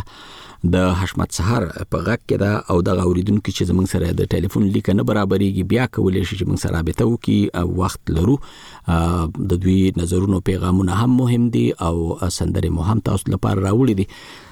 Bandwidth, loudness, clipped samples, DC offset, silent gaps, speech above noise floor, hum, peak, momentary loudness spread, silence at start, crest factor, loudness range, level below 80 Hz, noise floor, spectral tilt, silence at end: 16.5 kHz; -19 LUFS; under 0.1%; under 0.1%; none; 22 dB; none; -6 dBFS; 5 LU; 0 s; 12 dB; 2 LU; -34 dBFS; -40 dBFS; -7 dB/octave; 0.05 s